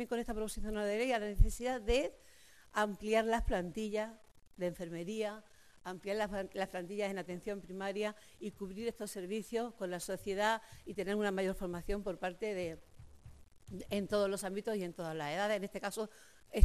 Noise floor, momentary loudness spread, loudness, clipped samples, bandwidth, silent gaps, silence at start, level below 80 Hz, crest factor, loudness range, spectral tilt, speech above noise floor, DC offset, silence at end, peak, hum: -57 dBFS; 10 LU; -38 LUFS; under 0.1%; 14 kHz; none; 0 s; -46 dBFS; 26 dB; 5 LU; -5 dB/octave; 20 dB; under 0.1%; 0 s; -10 dBFS; none